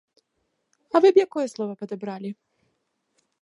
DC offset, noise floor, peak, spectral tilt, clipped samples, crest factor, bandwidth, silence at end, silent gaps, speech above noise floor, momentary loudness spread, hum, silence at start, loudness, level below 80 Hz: under 0.1%; -75 dBFS; -4 dBFS; -6 dB/octave; under 0.1%; 20 dB; 11 kHz; 1.1 s; none; 53 dB; 19 LU; none; 0.95 s; -22 LUFS; -80 dBFS